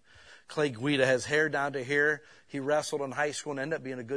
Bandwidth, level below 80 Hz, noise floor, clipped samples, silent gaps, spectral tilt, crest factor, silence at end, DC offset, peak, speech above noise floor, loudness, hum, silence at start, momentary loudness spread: 11 kHz; -72 dBFS; -55 dBFS; under 0.1%; none; -4 dB/octave; 20 dB; 0 s; under 0.1%; -10 dBFS; 25 dB; -29 LUFS; none; 0.25 s; 10 LU